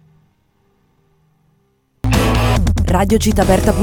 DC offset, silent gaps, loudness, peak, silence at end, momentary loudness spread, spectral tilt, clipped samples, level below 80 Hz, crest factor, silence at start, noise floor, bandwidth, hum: under 0.1%; none; -15 LUFS; 0 dBFS; 0 s; 3 LU; -6 dB/octave; under 0.1%; -22 dBFS; 16 dB; 2.05 s; -60 dBFS; 19 kHz; none